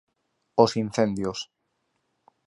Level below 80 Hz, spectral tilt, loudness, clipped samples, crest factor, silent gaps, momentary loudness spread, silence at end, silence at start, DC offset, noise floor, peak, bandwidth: -60 dBFS; -5.5 dB/octave; -25 LUFS; under 0.1%; 24 dB; none; 14 LU; 1.05 s; 0.55 s; under 0.1%; -75 dBFS; -4 dBFS; 11.5 kHz